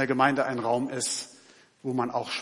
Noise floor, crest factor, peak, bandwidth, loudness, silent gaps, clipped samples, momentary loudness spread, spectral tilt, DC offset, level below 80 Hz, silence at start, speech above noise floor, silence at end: -56 dBFS; 20 dB; -8 dBFS; 11.5 kHz; -27 LUFS; none; under 0.1%; 11 LU; -3.5 dB/octave; under 0.1%; -78 dBFS; 0 s; 29 dB; 0 s